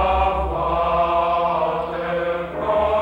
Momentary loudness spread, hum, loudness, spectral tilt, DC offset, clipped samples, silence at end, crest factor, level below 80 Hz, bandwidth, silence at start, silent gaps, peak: 6 LU; none; -21 LUFS; -7.5 dB/octave; under 0.1%; under 0.1%; 0 s; 12 dB; -34 dBFS; 8 kHz; 0 s; none; -8 dBFS